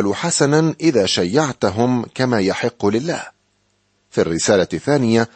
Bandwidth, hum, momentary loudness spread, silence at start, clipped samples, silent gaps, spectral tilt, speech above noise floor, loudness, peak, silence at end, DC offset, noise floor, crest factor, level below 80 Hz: 8.8 kHz; 50 Hz at -45 dBFS; 6 LU; 0 s; under 0.1%; none; -4.5 dB/octave; 47 dB; -18 LUFS; -2 dBFS; 0.1 s; under 0.1%; -64 dBFS; 16 dB; -54 dBFS